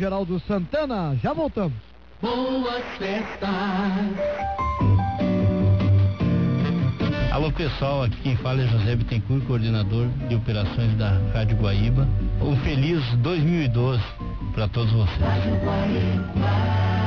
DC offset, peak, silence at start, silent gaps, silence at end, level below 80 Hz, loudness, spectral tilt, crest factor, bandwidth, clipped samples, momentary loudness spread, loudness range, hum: 0.4%; -12 dBFS; 0 s; none; 0 s; -32 dBFS; -23 LUFS; -9 dB/octave; 10 dB; 6.2 kHz; under 0.1%; 6 LU; 4 LU; none